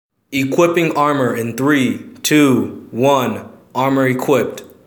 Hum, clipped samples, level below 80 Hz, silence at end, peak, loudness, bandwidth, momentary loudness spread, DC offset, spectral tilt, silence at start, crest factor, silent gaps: none; under 0.1%; -62 dBFS; 0.2 s; 0 dBFS; -16 LUFS; over 20 kHz; 10 LU; under 0.1%; -5 dB/octave; 0.3 s; 16 dB; none